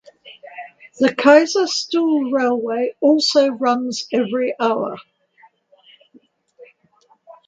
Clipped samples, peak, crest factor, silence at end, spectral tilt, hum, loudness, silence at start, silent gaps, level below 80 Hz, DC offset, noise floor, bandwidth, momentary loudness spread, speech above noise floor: under 0.1%; 0 dBFS; 20 dB; 0.15 s; -3.5 dB/octave; none; -17 LUFS; 0.25 s; none; -70 dBFS; under 0.1%; -58 dBFS; 9.2 kHz; 24 LU; 41 dB